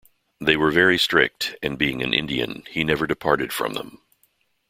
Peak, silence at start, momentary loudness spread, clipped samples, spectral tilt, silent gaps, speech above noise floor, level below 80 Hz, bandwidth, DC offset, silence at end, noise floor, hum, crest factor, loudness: -2 dBFS; 0.4 s; 10 LU; under 0.1%; -4 dB/octave; none; 44 dB; -50 dBFS; 16.5 kHz; under 0.1%; 0.75 s; -66 dBFS; none; 22 dB; -21 LUFS